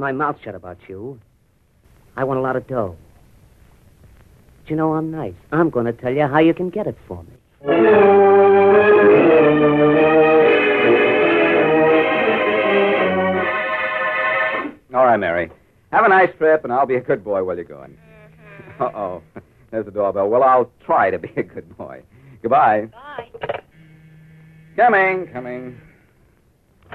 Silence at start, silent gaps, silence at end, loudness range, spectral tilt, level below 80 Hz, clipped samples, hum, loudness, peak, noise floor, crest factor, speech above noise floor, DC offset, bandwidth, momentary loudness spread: 0 s; none; 1.2 s; 13 LU; -8 dB/octave; -54 dBFS; under 0.1%; none; -16 LUFS; -2 dBFS; -58 dBFS; 16 dB; 40 dB; under 0.1%; 4.5 kHz; 21 LU